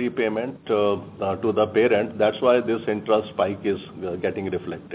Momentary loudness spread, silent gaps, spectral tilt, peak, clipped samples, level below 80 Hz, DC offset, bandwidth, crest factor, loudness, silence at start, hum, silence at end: 9 LU; none; -10 dB/octave; -6 dBFS; under 0.1%; -54 dBFS; under 0.1%; 4 kHz; 18 dB; -23 LUFS; 0 s; none; 0 s